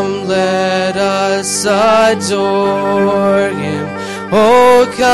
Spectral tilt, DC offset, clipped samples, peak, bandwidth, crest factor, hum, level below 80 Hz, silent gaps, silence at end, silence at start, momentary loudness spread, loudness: -4 dB/octave; under 0.1%; under 0.1%; 0 dBFS; 13.5 kHz; 10 dB; none; -48 dBFS; none; 0 s; 0 s; 9 LU; -12 LUFS